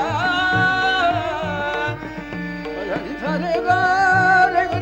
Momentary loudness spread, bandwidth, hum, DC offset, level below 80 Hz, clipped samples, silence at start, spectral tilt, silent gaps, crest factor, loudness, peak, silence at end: 13 LU; 16.5 kHz; none; under 0.1%; -44 dBFS; under 0.1%; 0 s; -5 dB/octave; none; 14 dB; -19 LUFS; -4 dBFS; 0 s